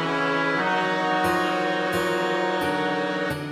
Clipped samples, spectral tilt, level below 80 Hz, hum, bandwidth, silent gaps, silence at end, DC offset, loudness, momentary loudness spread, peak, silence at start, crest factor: under 0.1%; -5 dB/octave; -54 dBFS; none; 16 kHz; none; 0 s; under 0.1%; -23 LUFS; 3 LU; -10 dBFS; 0 s; 12 dB